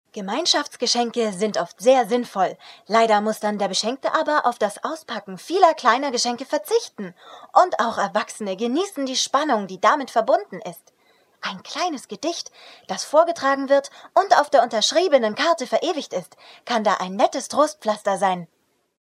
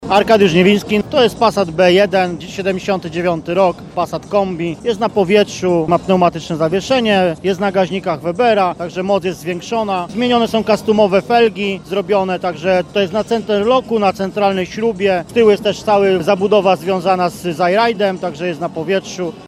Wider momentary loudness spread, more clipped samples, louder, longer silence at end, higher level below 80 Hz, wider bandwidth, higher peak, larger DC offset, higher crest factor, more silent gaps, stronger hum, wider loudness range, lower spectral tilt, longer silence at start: first, 13 LU vs 8 LU; neither; second, -21 LUFS vs -15 LUFS; first, 0.6 s vs 0 s; second, -80 dBFS vs -46 dBFS; about the same, 14.5 kHz vs 14.5 kHz; about the same, 0 dBFS vs 0 dBFS; neither; first, 22 dB vs 14 dB; neither; neither; about the same, 4 LU vs 2 LU; second, -3 dB/octave vs -5.5 dB/octave; first, 0.15 s vs 0 s